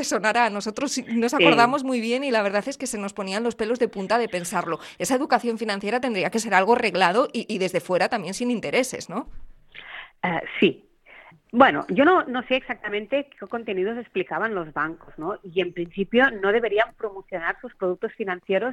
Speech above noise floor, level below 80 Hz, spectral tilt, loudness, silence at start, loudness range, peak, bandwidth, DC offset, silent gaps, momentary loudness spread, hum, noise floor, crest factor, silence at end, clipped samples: 26 dB; -56 dBFS; -4 dB/octave; -23 LUFS; 0 s; 5 LU; -2 dBFS; 14 kHz; under 0.1%; none; 12 LU; none; -50 dBFS; 22 dB; 0 s; under 0.1%